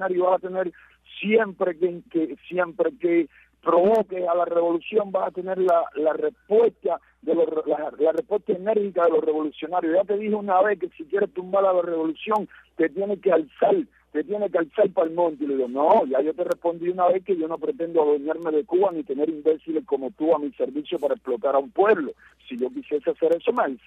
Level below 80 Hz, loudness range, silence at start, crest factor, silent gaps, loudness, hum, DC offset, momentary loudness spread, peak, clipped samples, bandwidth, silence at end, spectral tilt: -68 dBFS; 2 LU; 0 s; 16 dB; none; -23 LUFS; none; under 0.1%; 7 LU; -8 dBFS; under 0.1%; 4.3 kHz; 0.1 s; -7.5 dB/octave